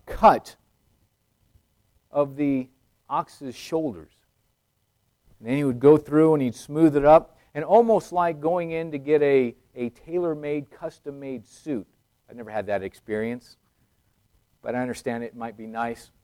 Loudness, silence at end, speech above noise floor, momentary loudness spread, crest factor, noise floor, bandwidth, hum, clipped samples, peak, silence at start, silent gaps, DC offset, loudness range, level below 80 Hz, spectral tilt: -23 LUFS; 0.3 s; 49 dB; 19 LU; 20 dB; -72 dBFS; 15 kHz; none; under 0.1%; -4 dBFS; 0.05 s; none; under 0.1%; 13 LU; -52 dBFS; -7.5 dB/octave